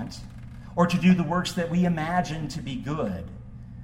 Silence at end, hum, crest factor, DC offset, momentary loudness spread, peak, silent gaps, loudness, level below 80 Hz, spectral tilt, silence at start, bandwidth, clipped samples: 0 s; none; 20 dB; under 0.1%; 21 LU; -6 dBFS; none; -25 LUFS; -46 dBFS; -6.5 dB/octave; 0 s; 13 kHz; under 0.1%